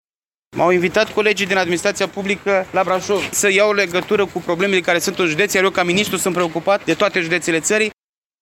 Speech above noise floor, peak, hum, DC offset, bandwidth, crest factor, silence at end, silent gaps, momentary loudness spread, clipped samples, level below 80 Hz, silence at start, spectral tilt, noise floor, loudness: 44 dB; -2 dBFS; none; under 0.1%; 17 kHz; 16 dB; 0.5 s; none; 4 LU; under 0.1%; -54 dBFS; 0.55 s; -3.5 dB/octave; -61 dBFS; -17 LUFS